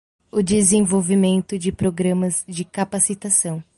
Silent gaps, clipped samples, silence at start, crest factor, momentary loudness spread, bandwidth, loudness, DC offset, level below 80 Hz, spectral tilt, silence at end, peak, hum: none; under 0.1%; 0.35 s; 16 dB; 10 LU; 11.5 kHz; -19 LUFS; under 0.1%; -50 dBFS; -5 dB/octave; 0.15 s; -4 dBFS; none